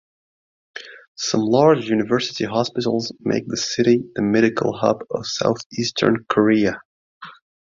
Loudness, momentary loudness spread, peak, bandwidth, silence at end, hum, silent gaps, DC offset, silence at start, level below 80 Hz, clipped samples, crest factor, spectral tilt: -20 LUFS; 10 LU; -2 dBFS; 7.6 kHz; 0.35 s; none; 1.08-1.15 s, 5.66-5.70 s, 6.85-7.21 s; under 0.1%; 0.75 s; -58 dBFS; under 0.1%; 18 dB; -5 dB/octave